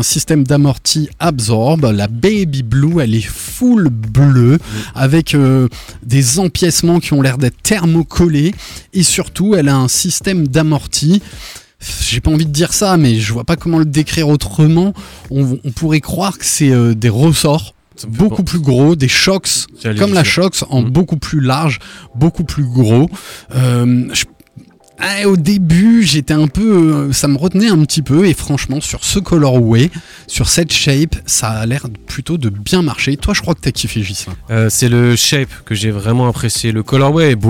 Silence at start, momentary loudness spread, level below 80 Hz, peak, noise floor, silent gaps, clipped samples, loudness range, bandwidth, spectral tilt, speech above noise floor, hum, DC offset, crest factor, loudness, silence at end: 0 s; 8 LU; -32 dBFS; 0 dBFS; -40 dBFS; none; under 0.1%; 2 LU; 17 kHz; -5 dB/octave; 28 dB; none; under 0.1%; 12 dB; -12 LUFS; 0 s